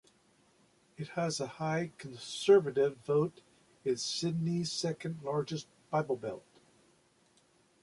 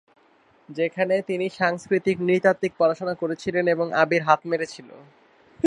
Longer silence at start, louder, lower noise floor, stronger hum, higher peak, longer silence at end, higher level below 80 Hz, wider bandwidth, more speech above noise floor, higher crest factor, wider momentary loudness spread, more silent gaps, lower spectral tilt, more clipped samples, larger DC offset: first, 1 s vs 0.7 s; second, -33 LUFS vs -23 LUFS; first, -69 dBFS vs -59 dBFS; neither; second, -14 dBFS vs -2 dBFS; first, 1.45 s vs 0 s; second, -74 dBFS vs -66 dBFS; about the same, 11.5 kHz vs 10.5 kHz; about the same, 36 dB vs 36 dB; about the same, 20 dB vs 22 dB; first, 16 LU vs 8 LU; neither; about the same, -5 dB/octave vs -6 dB/octave; neither; neither